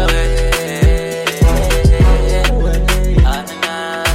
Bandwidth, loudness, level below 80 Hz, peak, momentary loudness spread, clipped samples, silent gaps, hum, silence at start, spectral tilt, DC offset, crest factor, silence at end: 16 kHz; -14 LUFS; -14 dBFS; 0 dBFS; 7 LU; under 0.1%; none; none; 0 s; -5 dB/octave; under 0.1%; 10 dB; 0 s